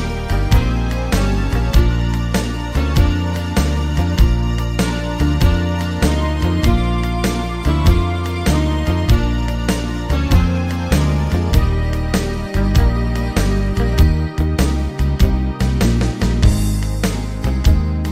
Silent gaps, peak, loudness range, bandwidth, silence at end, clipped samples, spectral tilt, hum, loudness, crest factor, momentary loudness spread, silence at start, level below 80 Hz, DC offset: none; 0 dBFS; 1 LU; 16 kHz; 0 s; under 0.1%; -6 dB/octave; none; -18 LUFS; 14 dB; 4 LU; 0 s; -18 dBFS; under 0.1%